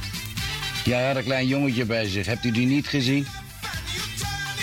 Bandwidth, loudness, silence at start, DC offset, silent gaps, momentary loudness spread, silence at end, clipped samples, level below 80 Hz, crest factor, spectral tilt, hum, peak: 17 kHz; -25 LUFS; 0 s; under 0.1%; none; 8 LU; 0 s; under 0.1%; -44 dBFS; 16 dB; -5 dB/octave; none; -10 dBFS